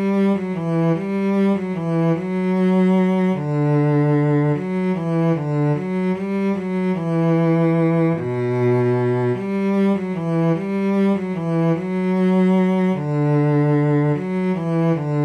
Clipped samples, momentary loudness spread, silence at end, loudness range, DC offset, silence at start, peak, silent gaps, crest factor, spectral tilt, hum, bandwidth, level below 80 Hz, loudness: under 0.1%; 5 LU; 0 s; 2 LU; under 0.1%; 0 s; -8 dBFS; none; 10 dB; -9.5 dB/octave; none; 8.6 kHz; -58 dBFS; -19 LUFS